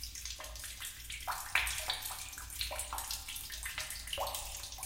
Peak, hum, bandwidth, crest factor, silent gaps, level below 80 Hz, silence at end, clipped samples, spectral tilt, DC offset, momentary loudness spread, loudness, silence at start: -14 dBFS; none; 17 kHz; 26 dB; none; -52 dBFS; 0 s; under 0.1%; 0 dB/octave; under 0.1%; 10 LU; -38 LUFS; 0 s